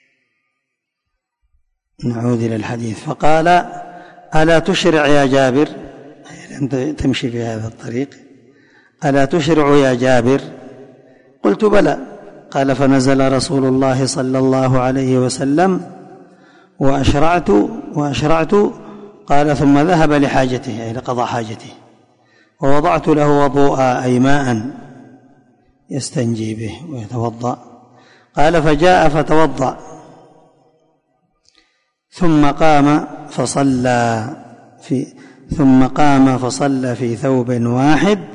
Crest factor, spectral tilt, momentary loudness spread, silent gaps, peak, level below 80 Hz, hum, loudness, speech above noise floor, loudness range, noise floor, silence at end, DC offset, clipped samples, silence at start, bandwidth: 14 dB; -6 dB/octave; 14 LU; none; 0 dBFS; -38 dBFS; none; -15 LUFS; 62 dB; 6 LU; -75 dBFS; 0 s; under 0.1%; under 0.1%; 0 s; 11 kHz